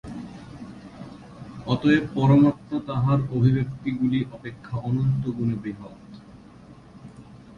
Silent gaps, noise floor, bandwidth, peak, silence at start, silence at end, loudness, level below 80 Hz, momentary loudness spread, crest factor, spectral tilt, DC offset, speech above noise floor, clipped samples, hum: none; -47 dBFS; 7 kHz; -6 dBFS; 0.05 s; 0.05 s; -23 LUFS; -52 dBFS; 23 LU; 18 dB; -9 dB/octave; under 0.1%; 25 dB; under 0.1%; none